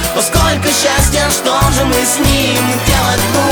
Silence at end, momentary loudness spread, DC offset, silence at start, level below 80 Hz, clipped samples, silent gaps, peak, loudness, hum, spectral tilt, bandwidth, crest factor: 0 s; 1 LU; under 0.1%; 0 s; -20 dBFS; under 0.1%; none; 0 dBFS; -11 LUFS; none; -3.5 dB/octave; over 20 kHz; 12 dB